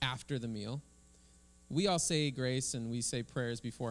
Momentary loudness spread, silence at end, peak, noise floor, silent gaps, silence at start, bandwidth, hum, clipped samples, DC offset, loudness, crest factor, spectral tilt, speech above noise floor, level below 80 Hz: 9 LU; 0 s; -16 dBFS; -63 dBFS; none; 0 s; 12 kHz; none; under 0.1%; under 0.1%; -36 LUFS; 20 dB; -4 dB/octave; 27 dB; -62 dBFS